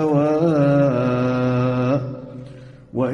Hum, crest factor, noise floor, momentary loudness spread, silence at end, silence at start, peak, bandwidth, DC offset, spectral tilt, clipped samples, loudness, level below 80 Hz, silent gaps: none; 12 dB; -40 dBFS; 19 LU; 0 s; 0 s; -6 dBFS; 9.2 kHz; under 0.1%; -9 dB/octave; under 0.1%; -19 LUFS; -52 dBFS; none